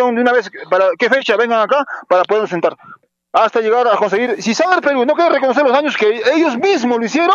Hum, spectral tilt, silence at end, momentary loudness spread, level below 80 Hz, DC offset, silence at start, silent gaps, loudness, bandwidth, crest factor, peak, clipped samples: none; -4 dB/octave; 0 s; 4 LU; -74 dBFS; under 0.1%; 0 s; none; -14 LUFS; 7.6 kHz; 14 dB; 0 dBFS; under 0.1%